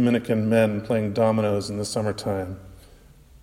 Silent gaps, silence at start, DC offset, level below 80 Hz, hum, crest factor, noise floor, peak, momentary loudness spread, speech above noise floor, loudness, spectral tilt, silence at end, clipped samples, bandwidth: none; 0 s; under 0.1%; -52 dBFS; none; 18 dB; -50 dBFS; -6 dBFS; 9 LU; 27 dB; -23 LUFS; -6.5 dB/octave; 0.6 s; under 0.1%; 15.5 kHz